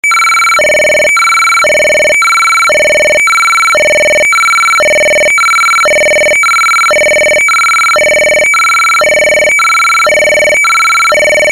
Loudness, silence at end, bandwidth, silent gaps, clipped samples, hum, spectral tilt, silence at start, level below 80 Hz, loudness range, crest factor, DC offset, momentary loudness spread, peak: -5 LUFS; 0 s; 15.5 kHz; none; under 0.1%; none; 0 dB/octave; 0.05 s; -42 dBFS; 0 LU; 4 dB; 0.3%; 0 LU; -4 dBFS